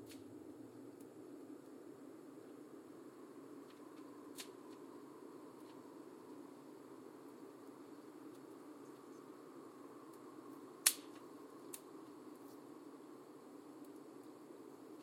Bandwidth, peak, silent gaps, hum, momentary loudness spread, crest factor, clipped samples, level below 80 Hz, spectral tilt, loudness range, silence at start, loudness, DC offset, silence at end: 16.5 kHz; -10 dBFS; none; none; 4 LU; 42 dB; under 0.1%; under -90 dBFS; -1.5 dB/octave; 13 LU; 0 s; -50 LUFS; under 0.1%; 0 s